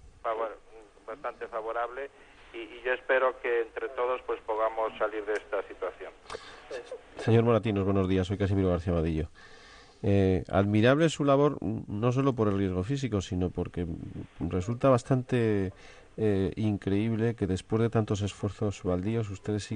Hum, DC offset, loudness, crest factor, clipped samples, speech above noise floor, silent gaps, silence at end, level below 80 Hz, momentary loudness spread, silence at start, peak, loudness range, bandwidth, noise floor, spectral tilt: none; under 0.1%; -29 LUFS; 18 dB; under 0.1%; 24 dB; none; 0 s; -52 dBFS; 16 LU; 0.05 s; -12 dBFS; 6 LU; 10 kHz; -53 dBFS; -7 dB/octave